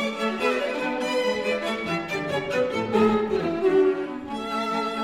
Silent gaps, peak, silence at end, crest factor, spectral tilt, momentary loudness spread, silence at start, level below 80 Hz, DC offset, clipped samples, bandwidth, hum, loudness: none; -8 dBFS; 0 s; 16 dB; -5 dB/octave; 7 LU; 0 s; -58 dBFS; under 0.1%; under 0.1%; 15 kHz; none; -25 LUFS